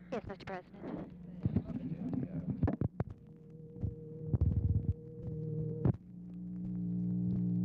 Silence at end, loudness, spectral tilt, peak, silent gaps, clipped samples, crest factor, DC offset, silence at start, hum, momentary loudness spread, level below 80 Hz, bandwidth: 0 s; -38 LUFS; -11 dB/octave; -18 dBFS; none; under 0.1%; 18 dB; under 0.1%; 0 s; none; 12 LU; -48 dBFS; 5.8 kHz